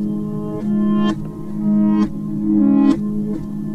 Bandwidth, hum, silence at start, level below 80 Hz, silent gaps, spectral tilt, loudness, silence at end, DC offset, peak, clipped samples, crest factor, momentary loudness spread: 6.6 kHz; none; 0 s; -44 dBFS; none; -9 dB/octave; -18 LUFS; 0 s; under 0.1%; -2 dBFS; under 0.1%; 14 dB; 10 LU